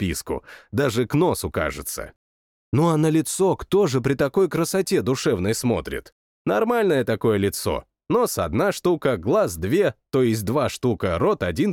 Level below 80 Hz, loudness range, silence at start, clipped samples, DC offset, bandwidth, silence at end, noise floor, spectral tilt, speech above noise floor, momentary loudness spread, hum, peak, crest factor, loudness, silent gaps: -46 dBFS; 2 LU; 0 s; under 0.1%; under 0.1%; 18 kHz; 0 s; under -90 dBFS; -5.5 dB/octave; over 69 dB; 9 LU; none; -8 dBFS; 14 dB; -22 LUFS; 2.16-2.72 s, 6.12-6.45 s